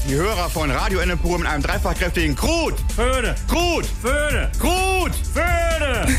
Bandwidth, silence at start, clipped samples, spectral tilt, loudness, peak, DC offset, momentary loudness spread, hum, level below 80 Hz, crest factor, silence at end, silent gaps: 15.5 kHz; 0 s; under 0.1%; -4.5 dB/octave; -20 LUFS; -6 dBFS; under 0.1%; 3 LU; none; -24 dBFS; 14 dB; 0 s; none